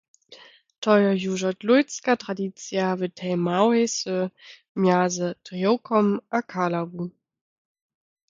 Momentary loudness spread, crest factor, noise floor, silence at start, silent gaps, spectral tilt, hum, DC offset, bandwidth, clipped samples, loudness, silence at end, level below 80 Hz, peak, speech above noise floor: 10 LU; 20 dB; -50 dBFS; 0.3 s; 0.78-0.82 s, 4.69-4.75 s; -5.5 dB/octave; none; under 0.1%; 7.6 kHz; under 0.1%; -24 LUFS; 1.2 s; -72 dBFS; -4 dBFS; 27 dB